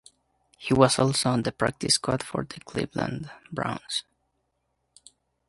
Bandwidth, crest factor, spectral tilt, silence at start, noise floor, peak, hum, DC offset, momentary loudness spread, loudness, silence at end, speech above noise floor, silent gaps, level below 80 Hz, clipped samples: 11.5 kHz; 26 dB; -4 dB/octave; 0.6 s; -76 dBFS; -2 dBFS; none; under 0.1%; 13 LU; -26 LUFS; 1.45 s; 50 dB; none; -56 dBFS; under 0.1%